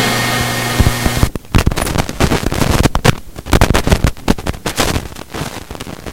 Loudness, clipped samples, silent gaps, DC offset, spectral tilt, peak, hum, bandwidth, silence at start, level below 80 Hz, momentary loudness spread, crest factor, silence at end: -15 LUFS; 0.4%; none; 1%; -4.5 dB/octave; 0 dBFS; none; 17.5 kHz; 0 s; -20 dBFS; 12 LU; 14 dB; 0 s